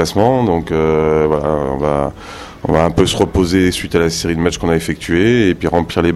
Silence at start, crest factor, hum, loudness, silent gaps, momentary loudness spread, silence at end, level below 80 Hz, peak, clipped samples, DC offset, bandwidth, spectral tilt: 0 s; 14 dB; none; -15 LUFS; none; 5 LU; 0 s; -34 dBFS; 0 dBFS; under 0.1%; under 0.1%; 14 kHz; -5.5 dB/octave